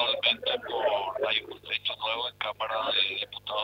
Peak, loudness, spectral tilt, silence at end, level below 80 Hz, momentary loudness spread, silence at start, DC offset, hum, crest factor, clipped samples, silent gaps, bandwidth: -10 dBFS; -28 LUFS; -3.5 dB/octave; 0 s; -68 dBFS; 7 LU; 0 s; under 0.1%; 50 Hz at -60 dBFS; 20 dB; under 0.1%; none; 16 kHz